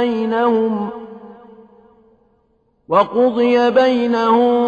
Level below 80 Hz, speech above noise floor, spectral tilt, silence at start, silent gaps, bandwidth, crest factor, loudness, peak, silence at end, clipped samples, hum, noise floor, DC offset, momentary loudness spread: -60 dBFS; 46 dB; -6.5 dB/octave; 0 s; none; 7 kHz; 16 dB; -15 LUFS; -2 dBFS; 0 s; under 0.1%; none; -61 dBFS; under 0.1%; 11 LU